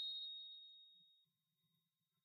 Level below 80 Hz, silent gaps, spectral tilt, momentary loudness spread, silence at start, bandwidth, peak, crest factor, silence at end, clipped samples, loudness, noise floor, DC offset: under -90 dBFS; none; 0.5 dB/octave; 19 LU; 0 s; 14.5 kHz; -38 dBFS; 16 dB; 1.05 s; under 0.1%; -50 LUFS; -89 dBFS; under 0.1%